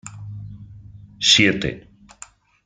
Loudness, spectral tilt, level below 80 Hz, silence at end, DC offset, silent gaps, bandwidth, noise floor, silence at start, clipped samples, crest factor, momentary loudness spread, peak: -16 LUFS; -2.5 dB/octave; -50 dBFS; 0.85 s; under 0.1%; none; 10 kHz; -46 dBFS; 0.05 s; under 0.1%; 22 dB; 25 LU; -2 dBFS